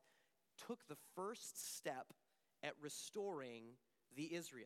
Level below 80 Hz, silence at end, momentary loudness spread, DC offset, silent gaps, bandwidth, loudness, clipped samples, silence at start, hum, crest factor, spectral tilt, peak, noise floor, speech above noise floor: under -90 dBFS; 0 s; 12 LU; under 0.1%; none; 16 kHz; -51 LUFS; under 0.1%; 0.6 s; none; 22 dB; -3 dB/octave; -30 dBFS; -81 dBFS; 30 dB